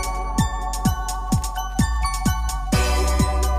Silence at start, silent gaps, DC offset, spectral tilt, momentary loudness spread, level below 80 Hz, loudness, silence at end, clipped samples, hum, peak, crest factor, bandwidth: 0 s; none; under 0.1%; -5 dB/octave; 4 LU; -24 dBFS; -23 LUFS; 0 s; under 0.1%; none; -6 dBFS; 14 dB; 16 kHz